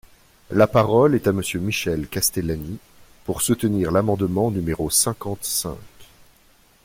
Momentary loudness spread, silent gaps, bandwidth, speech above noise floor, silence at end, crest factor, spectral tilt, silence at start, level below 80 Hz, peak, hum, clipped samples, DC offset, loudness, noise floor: 13 LU; none; 16.5 kHz; 35 dB; 0.8 s; 18 dB; -4.5 dB/octave; 0.5 s; -46 dBFS; -4 dBFS; none; under 0.1%; under 0.1%; -21 LUFS; -55 dBFS